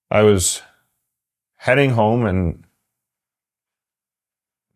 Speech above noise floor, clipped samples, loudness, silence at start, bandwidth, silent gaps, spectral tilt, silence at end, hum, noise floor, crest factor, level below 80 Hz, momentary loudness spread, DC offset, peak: over 74 dB; under 0.1%; -17 LUFS; 0.1 s; 15.5 kHz; none; -5 dB/octave; 2.2 s; none; under -90 dBFS; 20 dB; -38 dBFS; 12 LU; under 0.1%; -2 dBFS